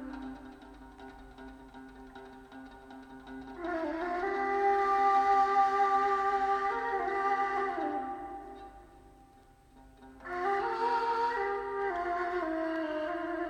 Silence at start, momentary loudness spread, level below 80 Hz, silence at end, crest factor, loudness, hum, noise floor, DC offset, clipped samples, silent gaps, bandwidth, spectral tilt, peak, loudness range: 0 s; 24 LU; -60 dBFS; 0 s; 16 dB; -31 LUFS; none; -59 dBFS; under 0.1%; under 0.1%; none; 9 kHz; -5 dB/octave; -16 dBFS; 14 LU